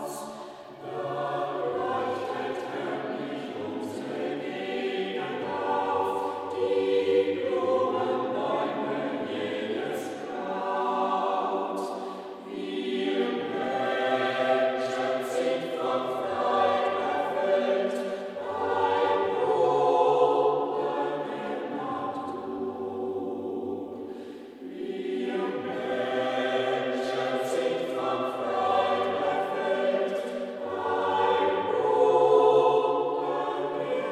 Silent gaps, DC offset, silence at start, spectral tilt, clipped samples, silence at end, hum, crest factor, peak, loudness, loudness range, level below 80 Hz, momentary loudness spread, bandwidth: none; under 0.1%; 0 s; -5 dB/octave; under 0.1%; 0 s; none; 18 dB; -10 dBFS; -28 LUFS; 8 LU; -76 dBFS; 11 LU; 13.5 kHz